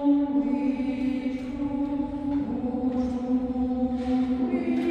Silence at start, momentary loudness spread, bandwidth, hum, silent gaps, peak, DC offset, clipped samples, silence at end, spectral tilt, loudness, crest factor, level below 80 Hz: 0 s; 4 LU; 6.6 kHz; none; none; -14 dBFS; under 0.1%; under 0.1%; 0 s; -8 dB/octave; -27 LUFS; 12 dB; -46 dBFS